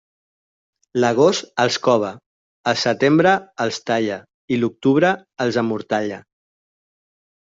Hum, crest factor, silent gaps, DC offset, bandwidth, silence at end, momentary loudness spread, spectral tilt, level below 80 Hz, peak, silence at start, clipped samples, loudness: none; 18 dB; 2.26-2.64 s, 4.34-4.48 s; under 0.1%; 7.8 kHz; 1.25 s; 11 LU; -5 dB/octave; -62 dBFS; -2 dBFS; 0.95 s; under 0.1%; -19 LUFS